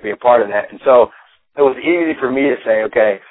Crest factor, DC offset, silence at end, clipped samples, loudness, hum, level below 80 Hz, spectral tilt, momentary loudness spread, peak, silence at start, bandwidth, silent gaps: 14 dB; under 0.1%; 0.1 s; under 0.1%; -14 LUFS; none; -56 dBFS; -9.5 dB/octave; 6 LU; 0 dBFS; 0 s; 4 kHz; none